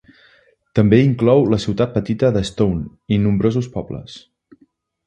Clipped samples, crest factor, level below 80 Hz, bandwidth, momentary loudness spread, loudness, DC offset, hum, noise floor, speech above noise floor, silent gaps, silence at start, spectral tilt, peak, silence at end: under 0.1%; 18 dB; -42 dBFS; 10 kHz; 14 LU; -17 LUFS; under 0.1%; none; -58 dBFS; 42 dB; none; 0.75 s; -8 dB/octave; 0 dBFS; 0.85 s